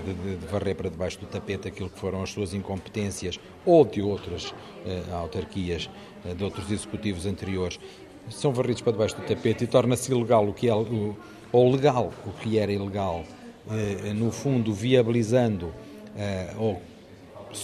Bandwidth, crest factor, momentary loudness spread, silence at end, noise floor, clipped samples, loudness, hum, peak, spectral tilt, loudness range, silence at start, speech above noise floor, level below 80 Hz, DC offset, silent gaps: 13.5 kHz; 22 dB; 16 LU; 0 s; -46 dBFS; under 0.1%; -27 LUFS; none; -4 dBFS; -6 dB/octave; 8 LU; 0 s; 20 dB; -52 dBFS; under 0.1%; none